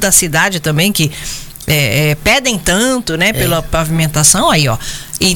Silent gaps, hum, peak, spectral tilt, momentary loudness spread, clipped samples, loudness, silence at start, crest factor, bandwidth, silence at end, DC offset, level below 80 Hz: none; none; 0 dBFS; -3 dB/octave; 9 LU; under 0.1%; -11 LUFS; 0 s; 12 dB; 18 kHz; 0 s; under 0.1%; -30 dBFS